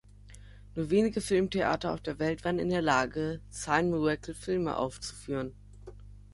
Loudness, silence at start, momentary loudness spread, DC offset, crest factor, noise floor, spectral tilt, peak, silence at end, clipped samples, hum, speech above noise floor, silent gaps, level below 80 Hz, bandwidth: -30 LUFS; 0.25 s; 14 LU; under 0.1%; 20 dB; -51 dBFS; -5.5 dB/octave; -12 dBFS; 0.1 s; under 0.1%; 50 Hz at -50 dBFS; 21 dB; none; -52 dBFS; 11.5 kHz